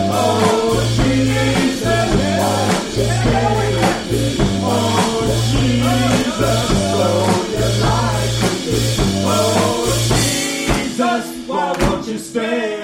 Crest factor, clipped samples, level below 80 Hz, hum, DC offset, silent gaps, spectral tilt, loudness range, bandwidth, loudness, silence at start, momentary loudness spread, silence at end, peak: 14 dB; under 0.1%; -30 dBFS; none; under 0.1%; none; -5 dB/octave; 1 LU; 16.5 kHz; -16 LUFS; 0 s; 4 LU; 0 s; -2 dBFS